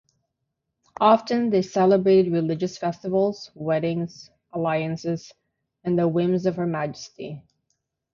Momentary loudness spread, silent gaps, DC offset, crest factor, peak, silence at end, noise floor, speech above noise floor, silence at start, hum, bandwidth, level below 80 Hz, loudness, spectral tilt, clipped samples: 16 LU; none; under 0.1%; 18 dB; -6 dBFS; 0.75 s; -80 dBFS; 57 dB; 1 s; none; 7.4 kHz; -64 dBFS; -23 LUFS; -7 dB/octave; under 0.1%